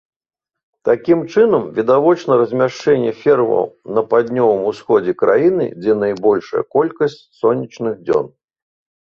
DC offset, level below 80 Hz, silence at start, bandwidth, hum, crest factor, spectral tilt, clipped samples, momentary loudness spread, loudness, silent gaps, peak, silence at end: under 0.1%; -58 dBFS; 0.85 s; 7 kHz; none; 14 dB; -7.5 dB/octave; under 0.1%; 7 LU; -16 LUFS; none; -2 dBFS; 0.85 s